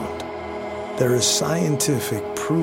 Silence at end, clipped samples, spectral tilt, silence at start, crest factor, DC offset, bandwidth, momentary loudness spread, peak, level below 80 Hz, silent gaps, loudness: 0 s; under 0.1%; -4 dB/octave; 0 s; 16 dB; under 0.1%; 17 kHz; 12 LU; -6 dBFS; -52 dBFS; none; -22 LUFS